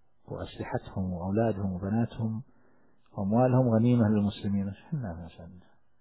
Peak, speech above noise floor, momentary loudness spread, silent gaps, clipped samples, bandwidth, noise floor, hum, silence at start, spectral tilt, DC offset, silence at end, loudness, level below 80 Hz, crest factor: -14 dBFS; 38 dB; 17 LU; none; under 0.1%; 4 kHz; -66 dBFS; none; 0.3 s; -12.5 dB/octave; 0.1%; 0.4 s; -29 LUFS; -52 dBFS; 16 dB